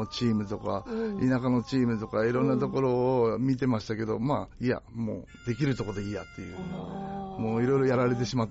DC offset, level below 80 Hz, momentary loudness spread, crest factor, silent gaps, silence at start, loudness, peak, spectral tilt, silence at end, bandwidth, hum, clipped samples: under 0.1%; -52 dBFS; 12 LU; 12 dB; none; 0 s; -29 LUFS; -16 dBFS; -6.5 dB/octave; 0 s; 8 kHz; none; under 0.1%